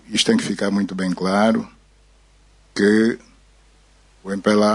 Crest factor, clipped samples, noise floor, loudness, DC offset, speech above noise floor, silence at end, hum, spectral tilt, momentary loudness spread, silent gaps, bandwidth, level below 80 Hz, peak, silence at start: 18 dB; under 0.1%; -53 dBFS; -19 LUFS; under 0.1%; 35 dB; 0 s; none; -4.5 dB/octave; 15 LU; none; 11 kHz; -54 dBFS; -4 dBFS; 0.1 s